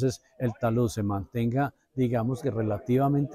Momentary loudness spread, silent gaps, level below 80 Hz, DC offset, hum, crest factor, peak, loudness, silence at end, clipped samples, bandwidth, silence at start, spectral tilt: 6 LU; none; -54 dBFS; under 0.1%; none; 12 dB; -14 dBFS; -28 LUFS; 0 s; under 0.1%; 14.5 kHz; 0 s; -8 dB/octave